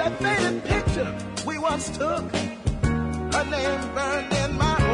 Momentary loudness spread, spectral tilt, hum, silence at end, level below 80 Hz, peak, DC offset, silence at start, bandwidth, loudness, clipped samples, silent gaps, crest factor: 6 LU; -5 dB/octave; none; 0 s; -36 dBFS; -8 dBFS; under 0.1%; 0 s; 11 kHz; -25 LUFS; under 0.1%; none; 16 dB